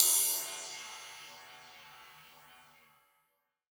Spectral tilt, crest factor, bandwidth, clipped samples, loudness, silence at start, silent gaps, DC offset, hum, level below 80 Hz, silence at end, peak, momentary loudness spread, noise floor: 2.5 dB/octave; 32 dB; over 20 kHz; under 0.1%; -32 LUFS; 0 s; none; under 0.1%; none; -84 dBFS; 1.55 s; -4 dBFS; 27 LU; -80 dBFS